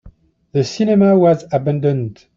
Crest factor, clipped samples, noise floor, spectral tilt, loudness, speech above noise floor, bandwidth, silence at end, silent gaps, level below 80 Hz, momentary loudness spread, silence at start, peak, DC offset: 12 dB; under 0.1%; -45 dBFS; -8 dB/octave; -15 LUFS; 30 dB; 7.6 kHz; 0.25 s; none; -50 dBFS; 10 LU; 0.05 s; -2 dBFS; under 0.1%